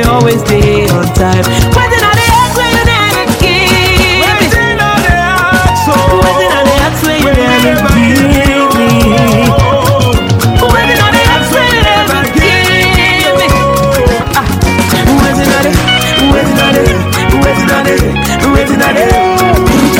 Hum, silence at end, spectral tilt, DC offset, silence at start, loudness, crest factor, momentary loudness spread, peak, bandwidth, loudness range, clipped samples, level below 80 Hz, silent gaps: none; 0 s; -4.5 dB/octave; under 0.1%; 0 s; -7 LUFS; 8 dB; 3 LU; 0 dBFS; 17.5 kHz; 1 LU; 0.3%; -18 dBFS; none